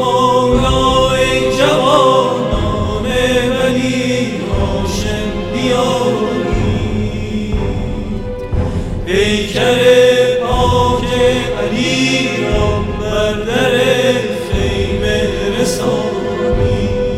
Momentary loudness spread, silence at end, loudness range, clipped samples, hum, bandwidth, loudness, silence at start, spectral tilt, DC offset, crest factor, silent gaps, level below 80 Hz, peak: 8 LU; 0 s; 5 LU; under 0.1%; none; 15.5 kHz; -14 LUFS; 0 s; -5 dB/octave; under 0.1%; 12 dB; none; -26 dBFS; 0 dBFS